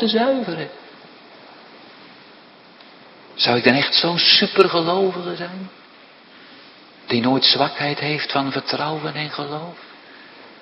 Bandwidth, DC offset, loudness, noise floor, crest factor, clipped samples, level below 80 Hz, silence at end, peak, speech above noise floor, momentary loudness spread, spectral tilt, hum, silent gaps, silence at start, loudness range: 6.4 kHz; under 0.1%; -18 LUFS; -46 dBFS; 22 dB; under 0.1%; -68 dBFS; 0.1 s; 0 dBFS; 27 dB; 18 LU; -6.5 dB/octave; none; none; 0 s; 7 LU